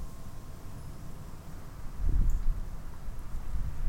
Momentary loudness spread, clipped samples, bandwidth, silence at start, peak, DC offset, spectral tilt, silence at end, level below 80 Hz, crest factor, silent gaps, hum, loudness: 14 LU; under 0.1%; 15.5 kHz; 0 s; -16 dBFS; under 0.1%; -6.5 dB/octave; 0 s; -32 dBFS; 14 dB; none; none; -40 LUFS